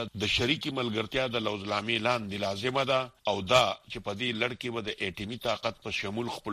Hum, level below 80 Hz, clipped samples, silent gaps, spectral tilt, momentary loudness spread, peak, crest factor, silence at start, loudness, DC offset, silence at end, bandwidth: none; -56 dBFS; under 0.1%; none; -4 dB/octave; 9 LU; -8 dBFS; 24 dB; 0 s; -30 LUFS; under 0.1%; 0 s; 15 kHz